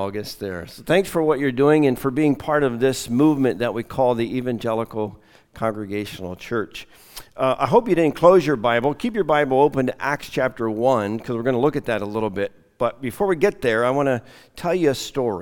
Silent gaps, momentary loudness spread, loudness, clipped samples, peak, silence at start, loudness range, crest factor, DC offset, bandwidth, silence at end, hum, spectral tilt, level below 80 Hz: none; 12 LU; -21 LUFS; under 0.1%; 0 dBFS; 0 s; 6 LU; 20 dB; under 0.1%; 18 kHz; 0 s; none; -6 dB/octave; -50 dBFS